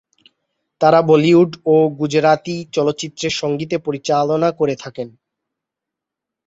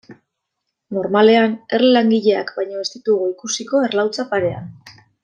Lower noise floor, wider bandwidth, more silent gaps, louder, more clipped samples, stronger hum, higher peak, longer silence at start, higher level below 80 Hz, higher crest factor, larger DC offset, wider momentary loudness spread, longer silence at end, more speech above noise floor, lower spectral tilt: first, -84 dBFS vs -77 dBFS; second, 8 kHz vs 9.4 kHz; neither; about the same, -16 LUFS vs -17 LUFS; neither; neither; about the same, -2 dBFS vs -2 dBFS; first, 0.8 s vs 0.1 s; about the same, -60 dBFS vs -64 dBFS; about the same, 16 dB vs 16 dB; neither; about the same, 11 LU vs 12 LU; first, 1.4 s vs 0.35 s; first, 68 dB vs 60 dB; first, -6 dB/octave vs -4.5 dB/octave